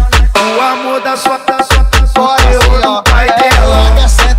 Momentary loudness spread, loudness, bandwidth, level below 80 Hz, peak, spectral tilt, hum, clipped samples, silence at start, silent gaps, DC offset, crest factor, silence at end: 5 LU; -9 LUFS; 16 kHz; -10 dBFS; 0 dBFS; -4 dB/octave; none; under 0.1%; 0 s; none; under 0.1%; 8 dB; 0 s